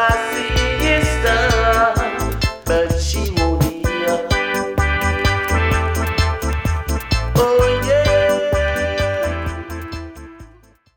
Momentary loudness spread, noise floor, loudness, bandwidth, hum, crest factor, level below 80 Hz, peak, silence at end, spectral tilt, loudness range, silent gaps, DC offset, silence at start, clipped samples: 8 LU; -48 dBFS; -17 LUFS; 18.5 kHz; none; 14 dB; -24 dBFS; -2 dBFS; 0.5 s; -5 dB/octave; 2 LU; none; under 0.1%; 0 s; under 0.1%